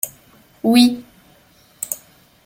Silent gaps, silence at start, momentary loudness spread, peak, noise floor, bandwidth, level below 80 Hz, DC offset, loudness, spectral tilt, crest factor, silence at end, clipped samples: none; 0.05 s; 17 LU; 0 dBFS; -52 dBFS; 16.5 kHz; -60 dBFS; under 0.1%; -18 LUFS; -3 dB/octave; 20 dB; 0.5 s; under 0.1%